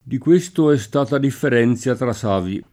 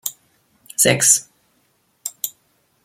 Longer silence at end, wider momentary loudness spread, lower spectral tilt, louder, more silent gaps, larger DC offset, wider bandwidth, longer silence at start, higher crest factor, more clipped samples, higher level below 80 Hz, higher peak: second, 0.1 s vs 0.55 s; second, 5 LU vs 18 LU; first, -6.5 dB/octave vs -1.5 dB/octave; about the same, -18 LUFS vs -17 LUFS; neither; neither; about the same, 16 kHz vs 16.5 kHz; about the same, 0.05 s vs 0.05 s; second, 14 dB vs 22 dB; neither; first, -54 dBFS vs -62 dBFS; second, -4 dBFS vs 0 dBFS